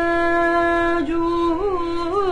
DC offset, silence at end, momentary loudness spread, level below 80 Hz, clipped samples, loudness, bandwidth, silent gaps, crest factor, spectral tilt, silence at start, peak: under 0.1%; 0 s; 5 LU; -36 dBFS; under 0.1%; -20 LUFS; 10 kHz; none; 10 dB; -6 dB/octave; 0 s; -8 dBFS